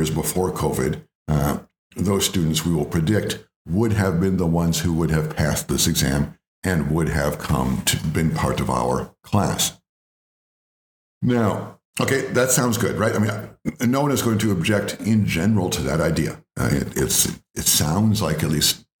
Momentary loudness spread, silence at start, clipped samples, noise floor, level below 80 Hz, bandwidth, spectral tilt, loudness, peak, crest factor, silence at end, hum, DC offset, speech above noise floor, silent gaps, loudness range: 7 LU; 0 s; under 0.1%; under -90 dBFS; -40 dBFS; over 20 kHz; -4.5 dB/octave; -21 LUFS; -2 dBFS; 18 dB; 0.25 s; none; under 0.1%; over 69 dB; 1.15-1.26 s, 1.78-1.90 s, 3.56-3.65 s, 6.48-6.62 s, 9.89-11.21 s, 11.85-11.93 s; 4 LU